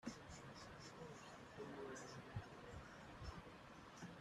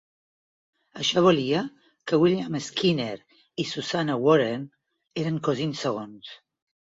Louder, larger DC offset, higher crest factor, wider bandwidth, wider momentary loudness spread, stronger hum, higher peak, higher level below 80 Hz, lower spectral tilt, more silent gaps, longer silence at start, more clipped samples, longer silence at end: second, -56 LUFS vs -25 LUFS; neither; about the same, 20 dB vs 20 dB; first, 13 kHz vs 7.8 kHz; second, 5 LU vs 19 LU; neither; second, -36 dBFS vs -6 dBFS; about the same, -68 dBFS vs -66 dBFS; about the same, -5 dB/octave vs -5.5 dB/octave; neither; second, 0 s vs 0.95 s; neither; second, 0 s vs 0.45 s